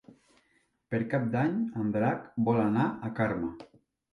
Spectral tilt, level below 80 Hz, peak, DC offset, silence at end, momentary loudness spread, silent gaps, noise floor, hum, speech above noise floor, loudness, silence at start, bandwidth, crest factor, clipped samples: -9.5 dB/octave; -62 dBFS; -14 dBFS; under 0.1%; 0.5 s; 9 LU; none; -72 dBFS; none; 43 dB; -30 LUFS; 0.9 s; 6 kHz; 16 dB; under 0.1%